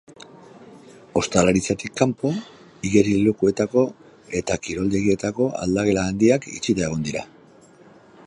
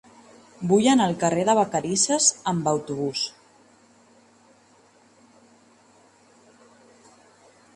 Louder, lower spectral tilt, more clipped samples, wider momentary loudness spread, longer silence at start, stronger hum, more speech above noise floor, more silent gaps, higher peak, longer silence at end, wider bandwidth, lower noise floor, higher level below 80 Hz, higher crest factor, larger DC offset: about the same, -22 LUFS vs -22 LUFS; first, -5.5 dB/octave vs -3.5 dB/octave; neither; about the same, 9 LU vs 10 LU; second, 0.1 s vs 0.6 s; neither; second, 29 dB vs 35 dB; neither; first, -2 dBFS vs -6 dBFS; second, 1 s vs 4.45 s; about the same, 11.5 kHz vs 11.5 kHz; second, -50 dBFS vs -57 dBFS; first, -48 dBFS vs -66 dBFS; about the same, 20 dB vs 20 dB; neither